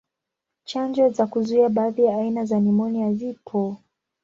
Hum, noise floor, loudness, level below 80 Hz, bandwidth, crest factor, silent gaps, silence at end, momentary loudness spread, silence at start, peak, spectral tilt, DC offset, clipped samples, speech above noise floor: none; -84 dBFS; -22 LUFS; -66 dBFS; 7.4 kHz; 14 dB; none; 0.45 s; 9 LU; 0.7 s; -8 dBFS; -8 dB/octave; under 0.1%; under 0.1%; 63 dB